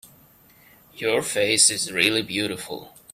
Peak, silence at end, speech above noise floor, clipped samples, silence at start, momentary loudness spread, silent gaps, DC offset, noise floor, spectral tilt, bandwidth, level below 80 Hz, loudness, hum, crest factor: -2 dBFS; 0.25 s; 31 dB; under 0.1%; 0.05 s; 16 LU; none; under 0.1%; -54 dBFS; -1.5 dB/octave; 16 kHz; -64 dBFS; -20 LUFS; none; 22 dB